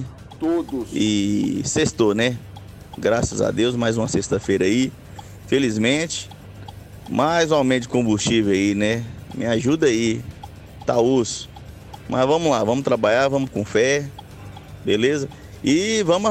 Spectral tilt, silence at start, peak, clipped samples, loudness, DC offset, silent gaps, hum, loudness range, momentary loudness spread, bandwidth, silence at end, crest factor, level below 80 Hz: -5 dB/octave; 0 s; -6 dBFS; under 0.1%; -20 LUFS; under 0.1%; none; none; 2 LU; 21 LU; 15 kHz; 0 s; 14 dB; -46 dBFS